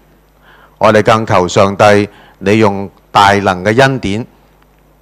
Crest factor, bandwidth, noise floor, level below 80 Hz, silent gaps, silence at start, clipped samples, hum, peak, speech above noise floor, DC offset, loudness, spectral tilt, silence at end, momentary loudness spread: 12 dB; 15 kHz; -47 dBFS; -42 dBFS; none; 0.8 s; 1%; none; 0 dBFS; 38 dB; under 0.1%; -10 LUFS; -5.5 dB/octave; 0.75 s; 12 LU